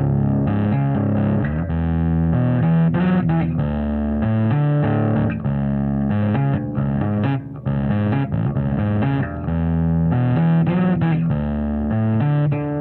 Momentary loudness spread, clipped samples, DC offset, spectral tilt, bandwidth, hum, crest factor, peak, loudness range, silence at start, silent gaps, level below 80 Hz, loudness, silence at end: 5 LU; under 0.1%; under 0.1%; -12 dB/octave; 4.1 kHz; none; 12 dB; -8 dBFS; 2 LU; 0 s; none; -34 dBFS; -19 LUFS; 0 s